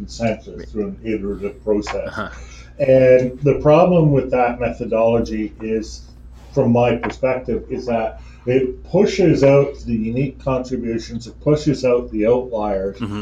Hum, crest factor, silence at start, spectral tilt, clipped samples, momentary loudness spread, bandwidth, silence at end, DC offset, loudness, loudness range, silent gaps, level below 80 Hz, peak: none; 16 dB; 0 s; -7.5 dB/octave; under 0.1%; 13 LU; 8 kHz; 0 s; under 0.1%; -18 LUFS; 5 LU; none; -38 dBFS; -2 dBFS